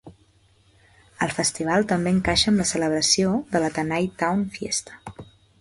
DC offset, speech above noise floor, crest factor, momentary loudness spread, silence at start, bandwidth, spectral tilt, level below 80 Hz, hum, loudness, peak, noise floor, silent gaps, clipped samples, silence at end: under 0.1%; 37 dB; 18 dB; 9 LU; 0.05 s; 11.5 kHz; -3.5 dB/octave; -48 dBFS; none; -22 LUFS; -6 dBFS; -59 dBFS; none; under 0.1%; 0.35 s